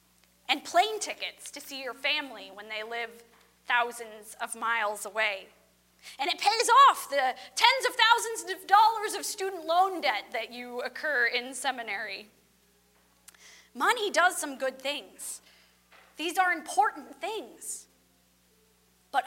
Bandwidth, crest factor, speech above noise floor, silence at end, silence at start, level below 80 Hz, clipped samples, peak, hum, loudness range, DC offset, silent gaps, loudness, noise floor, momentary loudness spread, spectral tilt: 16.5 kHz; 26 dB; 37 dB; 0 s; 0.5 s; -76 dBFS; under 0.1%; -4 dBFS; 60 Hz at -70 dBFS; 9 LU; under 0.1%; none; -27 LUFS; -66 dBFS; 17 LU; 0.5 dB/octave